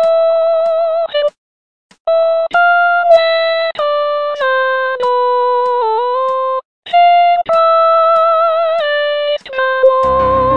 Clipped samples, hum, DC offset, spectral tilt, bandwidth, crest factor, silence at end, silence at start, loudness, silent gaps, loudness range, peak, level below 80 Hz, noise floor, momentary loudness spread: under 0.1%; none; 0.8%; -5 dB/octave; 5.8 kHz; 12 dB; 0 s; 0 s; -12 LUFS; 1.37-1.89 s, 2.00-2.05 s, 6.65-6.83 s; 2 LU; 0 dBFS; -42 dBFS; under -90 dBFS; 7 LU